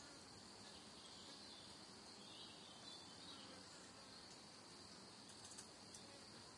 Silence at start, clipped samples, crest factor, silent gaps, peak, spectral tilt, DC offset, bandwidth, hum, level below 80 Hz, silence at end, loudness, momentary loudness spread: 0 s; under 0.1%; 20 dB; none; -40 dBFS; -2 dB/octave; under 0.1%; 12 kHz; none; -84 dBFS; 0 s; -58 LUFS; 3 LU